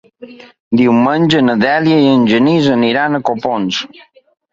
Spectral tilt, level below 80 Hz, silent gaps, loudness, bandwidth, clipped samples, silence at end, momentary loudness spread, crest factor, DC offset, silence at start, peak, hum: -6.5 dB/octave; -54 dBFS; 0.60-0.71 s; -12 LUFS; 7.6 kHz; under 0.1%; 0.65 s; 7 LU; 12 dB; under 0.1%; 0.2 s; 0 dBFS; none